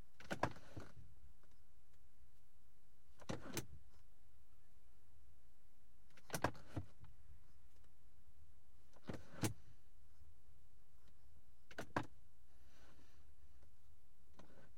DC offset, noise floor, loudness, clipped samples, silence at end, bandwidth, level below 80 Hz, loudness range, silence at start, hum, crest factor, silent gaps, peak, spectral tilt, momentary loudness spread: 0.5%; -74 dBFS; -49 LUFS; under 0.1%; 0.1 s; 16.5 kHz; -70 dBFS; 4 LU; 0.2 s; none; 32 dB; none; -22 dBFS; -4.5 dB/octave; 24 LU